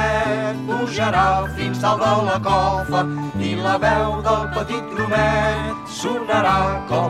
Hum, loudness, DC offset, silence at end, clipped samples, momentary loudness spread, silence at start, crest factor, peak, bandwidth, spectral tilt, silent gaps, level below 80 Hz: none; -20 LUFS; under 0.1%; 0 s; under 0.1%; 7 LU; 0 s; 14 dB; -4 dBFS; 14.5 kHz; -5.5 dB/octave; none; -36 dBFS